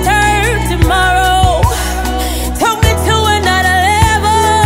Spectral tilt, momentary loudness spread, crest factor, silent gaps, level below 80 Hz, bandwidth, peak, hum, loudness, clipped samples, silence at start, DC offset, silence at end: -4 dB/octave; 6 LU; 10 dB; none; -20 dBFS; 16.5 kHz; 0 dBFS; none; -11 LUFS; under 0.1%; 0 s; under 0.1%; 0 s